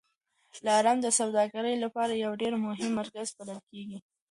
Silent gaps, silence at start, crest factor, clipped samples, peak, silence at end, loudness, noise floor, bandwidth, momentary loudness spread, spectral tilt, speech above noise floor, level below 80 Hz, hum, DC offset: 3.63-3.67 s; 0.55 s; 18 dB; under 0.1%; -12 dBFS; 0.3 s; -29 LUFS; -73 dBFS; 11.5 kHz; 18 LU; -3 dB/octave; 44 dB; -76 dBFS; none; under 0.1%